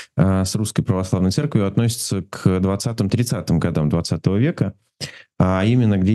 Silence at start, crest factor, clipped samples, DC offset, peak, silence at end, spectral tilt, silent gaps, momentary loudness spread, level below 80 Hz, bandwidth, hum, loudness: 0 s; 18 dB; under 0.1%; under 0.1%; -2 dBFS; 0 s; -6.5 dB/octave; none; 8 LU; -44 dBFS; 12.5 kHz; none; -20 LUFS